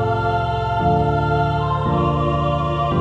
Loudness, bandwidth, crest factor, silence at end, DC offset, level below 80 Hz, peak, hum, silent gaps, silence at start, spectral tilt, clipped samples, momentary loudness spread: -19 LUFS; 7.8 kHz; 12 dB; 0 s; under 0.1%; -32 dBFS; -6 dBFS; none; none; 0 s; -8.5 dB/octave; under 0.1%; 2 LU